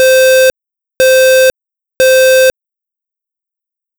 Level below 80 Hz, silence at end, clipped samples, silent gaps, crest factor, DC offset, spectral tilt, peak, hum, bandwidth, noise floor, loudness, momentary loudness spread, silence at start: -50 dBFS; 1.5 s; under 0.1%; none; 4 dB; under 0.1%; 0 dB/octave; -6 dBFS; none; over 20 kHz; -84 dBFS; -8 LUFS; 6 LU; 0 s